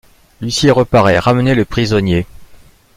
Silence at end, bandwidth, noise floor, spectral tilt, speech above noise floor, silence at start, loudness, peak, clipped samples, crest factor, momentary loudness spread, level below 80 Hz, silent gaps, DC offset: 0.4 s; 16 kHz; -42 dBFS; -6 dB/octave; 30 dB; 0.4 s; -13 LUFS; 0 dBFS; under 0.1%; 14 dB; 9 LU; -36 dBFS; none; under 0.1%